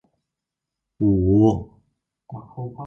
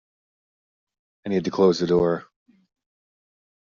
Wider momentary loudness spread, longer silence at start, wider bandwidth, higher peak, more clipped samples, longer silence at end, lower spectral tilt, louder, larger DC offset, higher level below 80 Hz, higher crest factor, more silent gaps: first, 23 LU vs 11 LU; second, 1 s vs 1.25 s; about the same, 6.8 kHz vs 7.4 kHz; about the same, -6 dBFS vs -6 dBFS; neither; second, 0 s vs 1.4 s; first, -11 dB/octave vs -6 dB/octave; first, -19 LUFS vs -22 LUFS; neither; first, -40 dBFS vs -58 dBFS; about the same, 16 dB vs 20 dB; neither